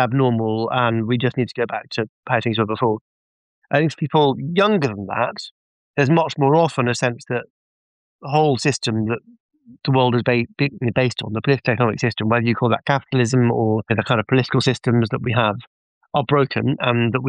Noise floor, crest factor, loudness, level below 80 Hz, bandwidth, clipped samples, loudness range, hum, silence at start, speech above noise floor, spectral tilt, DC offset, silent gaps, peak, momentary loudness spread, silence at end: under -90 dBFS; 16 dB; -20 LUFS; -58 dBFS; 10 kHz; under 0.1%; 3 LU; none; 0 s; over 71 dB; -6.5 dB/octave; under 0.1%; 2.09-2.23 s, 3.01-3.62 s, 5.51-5.94 s, 7.50-8.19 s, 9.40-9.49 s, 15.67-16.01 s; -4 dBFS; 8 LU; 0 s